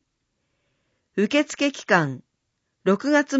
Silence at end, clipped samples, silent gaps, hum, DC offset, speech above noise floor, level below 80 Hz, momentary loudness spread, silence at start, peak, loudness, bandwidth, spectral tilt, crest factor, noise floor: 0 s; under 0.1%; none; none; under 0.1%; 55 dB; -74 dBFS; 10 LU; 1.15 s; -4 dBFS; -23 LUFS; 8 kHz; -5 dB/octave; 20 dB; -76 dBFS